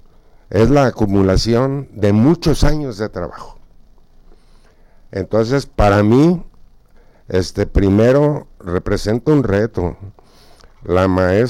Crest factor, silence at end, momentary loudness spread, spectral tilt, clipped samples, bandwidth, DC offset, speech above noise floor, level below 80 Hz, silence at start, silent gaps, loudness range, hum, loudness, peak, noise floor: 14 dB; 0 s; 12 LU; -7 dB/octave; under 0.1%; 15.5 kHz; under 0.1%; 32 dB; -28 dBFS; 0.5 s; none; 5 LU; none; -16 LUFS; -2 dBFS; -46 dBFS